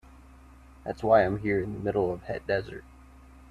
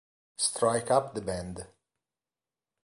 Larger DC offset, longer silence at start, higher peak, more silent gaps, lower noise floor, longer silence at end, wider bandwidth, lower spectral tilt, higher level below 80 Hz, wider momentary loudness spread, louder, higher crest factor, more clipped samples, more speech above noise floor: neither; second, 0.2 s vs 0.4 s; first, -8 dBFS vs -12 dBFS; neither; second, -52 dBFS vs under -90 dBFS; second, 0.7 s vs 1.15 s; about the same, 11.5 kHz vs 11.5 kHz; first, -8 dB/octave vs -3.5 dB/octave; first, -50 dBFS vs -58 dBFS; about the same, 18 LU vs 20 LU; about the same, -27 LUFS vs -29 LUFS; about the same, 22 dB vs 22 dB; neither; second, 25 dB vs over 61 dB